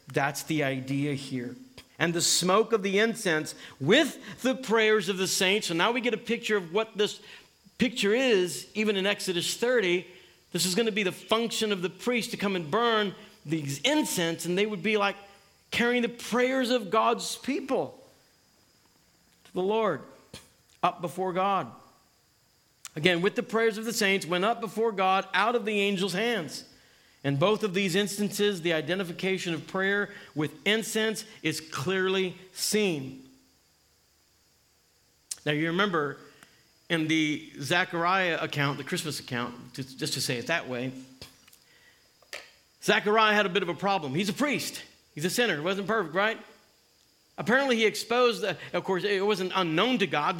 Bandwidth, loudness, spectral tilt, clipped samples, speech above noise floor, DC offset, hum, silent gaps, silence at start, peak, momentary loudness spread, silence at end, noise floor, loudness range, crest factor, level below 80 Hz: 17 kHz; -27 LUFS; -3.5 dB/octave; under 0.1%; 38 dB; under 0.1%; none; none; 0.1 s; -4 dBFS; 10 LU; 0 s; -66 dBFS; 7 LU; 24 dB; -72 dBFS